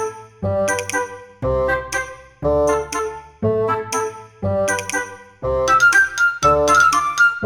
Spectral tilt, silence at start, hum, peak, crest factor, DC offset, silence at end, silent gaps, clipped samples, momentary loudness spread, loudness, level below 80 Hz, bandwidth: -3.5 dB/octave; 0 s; none; -4 dBFS; 16 dB; under 0.1%; 0 s; none; under 0.1%; 15 LU; -18 LUFS; -40 dBFS; 19.5 kHz